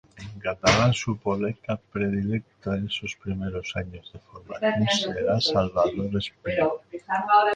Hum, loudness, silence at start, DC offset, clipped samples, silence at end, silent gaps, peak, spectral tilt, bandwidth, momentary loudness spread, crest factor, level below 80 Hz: none; -26 LUFS; 0.15 s; under 0.1%; under 0.1%; 0 s; none; -4 dBFS; -5 dB/octave; 9.4 kHz; 12 LU; 20 dB; -48 dBFS